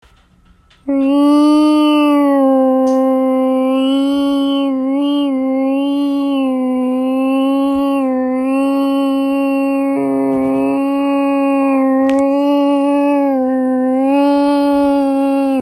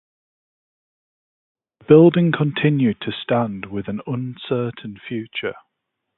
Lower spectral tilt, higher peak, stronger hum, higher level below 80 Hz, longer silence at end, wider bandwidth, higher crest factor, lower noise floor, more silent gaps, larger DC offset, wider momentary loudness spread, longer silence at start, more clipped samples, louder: second, -5.5 dB/octave vs -12 dB/octave; second, -4 dBFS vs 0 dBFS; neither; about the same, -54 dBFS vs -58 dBFS; second, 0 s vs 0.65 s; first, 13 kHz vs 4.1 kHz; second, 10 dB vs 20 dB; second, -49 dBFS vs -78 dBFS; neither; neither; second, 5 LU vs 17 LU; second, 0.85 s vs 1.9 s; neither; first, -14 LUFS vs -19 LUFS